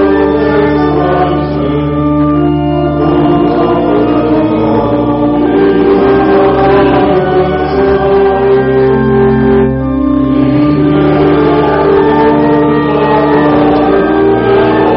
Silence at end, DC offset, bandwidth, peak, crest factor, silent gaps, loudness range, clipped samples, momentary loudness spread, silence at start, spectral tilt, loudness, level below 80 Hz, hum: 0 s; under 0.1%; 5.6 kHz; 0 dBFS; 8 dB; none; 2 LU; under 0.1%; 3 LU; 0 s; -6.5 dB/octave; -9 LUFS; -26 dBFS; none